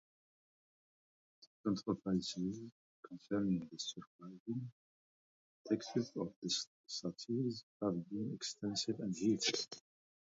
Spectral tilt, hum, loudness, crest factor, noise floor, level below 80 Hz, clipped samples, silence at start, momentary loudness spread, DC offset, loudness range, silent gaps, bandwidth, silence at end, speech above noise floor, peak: -5 dB/octave; none; -40 LUFS; 20 dB; under -90 dBFS; -74 dBFS; under 0.1%; 1.4 s; 15 LU; under 0.1%; 4 LU; 1.47-1.64 s, 2.72-3.03 s, 4.07-4.19 s, 4.40-4.46 s, 4.72-5.65 s, 6.36-6.42 s, 6.67-6.84 s, 7.63-7.80 s; 7.6 kHz; 0.5 s; over 50 dB; -22 dBFS